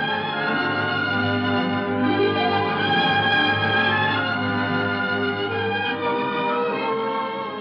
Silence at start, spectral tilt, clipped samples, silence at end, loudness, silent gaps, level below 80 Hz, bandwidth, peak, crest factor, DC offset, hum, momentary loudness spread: 0 s; -7 dB/octave; under 0.1%; 0 s; -21 LUFS; none; -62 dBFS; 6 kHz; -10 dBFS; 12 dB; under 0.1%; none; 5 LU